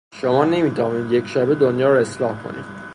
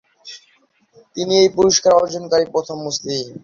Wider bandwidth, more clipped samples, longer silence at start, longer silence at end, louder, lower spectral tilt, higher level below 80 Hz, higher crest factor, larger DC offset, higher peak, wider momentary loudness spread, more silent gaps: first, 11 kHz vs 7.4 kHz; neither; about the same, 0.15 s vs 0.25 s; about the same, 0 s vs 0.05 s; about the same, -19 LUFS vs -17 LUFS; first, -7 dB/octave vs -3.5 dB/octave; about the same, -58 dBFS vs -54 dBFS; about the same, 16 dB vs 16 dB; neither; about the same, -2 dBFS vs -2 dBFS; second, 11 LU vs 22 LU; neither